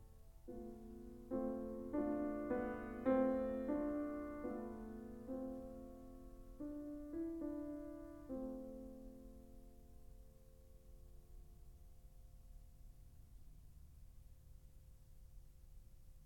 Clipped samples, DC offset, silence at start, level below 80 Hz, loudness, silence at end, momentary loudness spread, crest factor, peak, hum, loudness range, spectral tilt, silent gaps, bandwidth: under 0.1%; under 0.1%; 0 s; -60 dBFS; -45 LUFS; 0 s; 24 LU; 22 dB; -24 dBFS; none; 23 LU; -8.5 dB/octave; none; 18 kHz